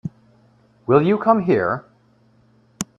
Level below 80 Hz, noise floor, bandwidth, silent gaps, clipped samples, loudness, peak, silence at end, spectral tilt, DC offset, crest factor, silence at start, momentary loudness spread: -58 dBFS; -56 dBFS; 14.5 kHz; none; under 0.1%; -18 LUFS; 0 dBFS; 0.15 s; -6.5 dB/octave; under 0.1%; 20 dB; 0.05 s; 17 LU